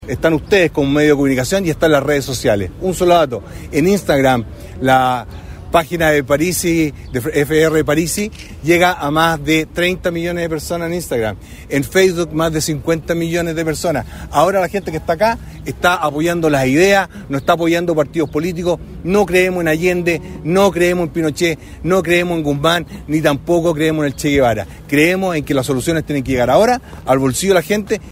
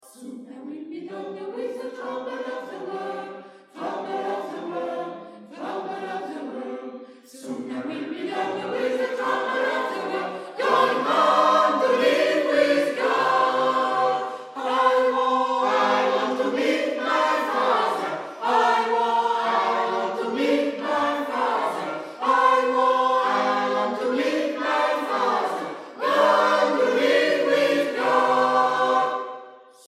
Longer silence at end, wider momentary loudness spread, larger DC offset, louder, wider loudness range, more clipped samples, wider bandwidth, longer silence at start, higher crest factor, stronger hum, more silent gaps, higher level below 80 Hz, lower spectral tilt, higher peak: second, 0 s vs 0.3 s; second, 8 LU vs 14 LU; neither; first, -15 LUFS vs -23 LUFS; second, 2 LU vs 12 LU; neither; first, 16 kHz vs 14 kHz; second, 0 s vs 0.2 s; about the same, 16 dB vs 18 dB; neither; neither; first, -36 dBFS vs -80 dBFS; first, -5 dB/octave vs -3.5 dB/octave; first, 0 dBFS vs -6 dBFS